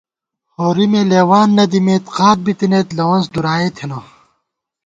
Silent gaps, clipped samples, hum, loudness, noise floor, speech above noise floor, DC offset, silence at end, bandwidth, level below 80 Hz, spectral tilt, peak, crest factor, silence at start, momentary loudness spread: none; under 0.1%; none; -14 LUFS; -72 dBFS; 59 dB; under 0.1%; 0.85 s; 7.8 kHz; -54 dBFS; -6.5 dB/octave; 0 dBFS; 14 dB; 0.6 s; 10 LU